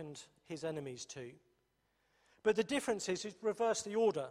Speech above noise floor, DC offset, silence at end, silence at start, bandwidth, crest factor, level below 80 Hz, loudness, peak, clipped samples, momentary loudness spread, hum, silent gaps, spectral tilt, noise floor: 42 dB; under 0.1%; 0 s; 0 s; 13.5 kHz; 20 dB; -76 dBFS; -37 LUFS; -18 dBFS; under 0.1%; 16 LU; none; none; -4 dB/octave; -79 dBFS